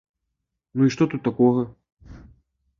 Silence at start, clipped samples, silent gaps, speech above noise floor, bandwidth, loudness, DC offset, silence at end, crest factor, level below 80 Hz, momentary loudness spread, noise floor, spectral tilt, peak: 0.75 s; under 0.1%; 1.92-1.97 s; 60 dB; 7.2 kHz; -22 LUFS; under 0.1%; 0.6 s; 18 dB; -54 dBFS; 12 LU; -80 dBFS; -7.5 dB/octave; -6 dBFS